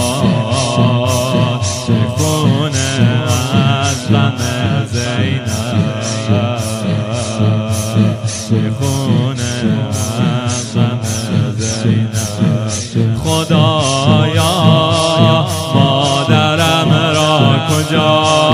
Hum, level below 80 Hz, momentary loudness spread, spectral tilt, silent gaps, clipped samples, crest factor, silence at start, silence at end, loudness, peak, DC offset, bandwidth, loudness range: none; -44 dBFS; 6 LU; -5 dB/octave; none; under 0.1%; 12 dB; 0 s; 0 s; -13 LUFS; 0 dBFS; under 0.1%; 16 kHz; 4 LU